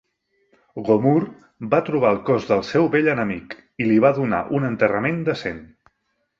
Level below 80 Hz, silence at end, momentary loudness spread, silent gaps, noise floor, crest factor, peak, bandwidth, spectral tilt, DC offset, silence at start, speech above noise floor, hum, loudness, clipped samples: -56 dBFS; 0.75 s; 15 LU; none; -72 dBFS; 18 dB; -2 dBFS; 7.4 kHz; -8 dB/octave; under 0.1%; 0.75 s; 52 dB; none; -20 LUFS; under 0.1%